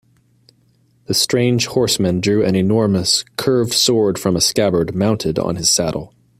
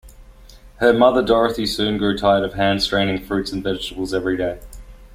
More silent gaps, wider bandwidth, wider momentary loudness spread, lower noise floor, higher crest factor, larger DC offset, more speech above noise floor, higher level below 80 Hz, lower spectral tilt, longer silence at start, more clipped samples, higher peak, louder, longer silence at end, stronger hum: neither; about the same, 16 kHz vs 16 kHz; second, 4 LU vs 10 LU; first, -57 dBFS vs -44 dBFS; about the same, 16 dB vs 18 dB; neither; first, 41 dB vs 25 dB; second, -48 dBFS vs -40 dBFS; second, -4 dB/octave vs -5.5 dB/octave; first, 1.1 s vs 0.05 s; neither; about the same, -2 dBFS vs -2 dBFS; first, -16 LUFS vs -19 LUFS; first, 0.3 s vs 0 s; neither